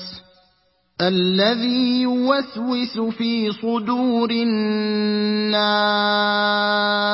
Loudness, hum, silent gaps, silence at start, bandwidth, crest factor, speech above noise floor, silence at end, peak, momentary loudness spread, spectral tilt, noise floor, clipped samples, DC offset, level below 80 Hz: -19 LUFS; none; none; 0 s; 5.8 kHz; 16 dB; 44 dB; 0 s; -4 dBFS; 6 LU; -9 dB/octave; -63 dBFS; under 0.1%; under 0.1%; -66 dBFS